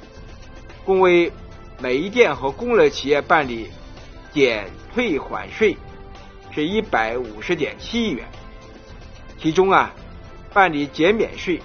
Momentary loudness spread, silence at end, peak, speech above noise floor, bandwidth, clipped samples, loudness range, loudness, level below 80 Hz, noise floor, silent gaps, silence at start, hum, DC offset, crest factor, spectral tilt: 19 LU; 0 s; 0 dBFS; 21 dB; 6.8 kHz; under 0.1%; 6 LU; -20 LUFS; -42 dBFS; -40 dBFS; none; 0 s; none; under 0.1%; 20 dB; -3 dB/octave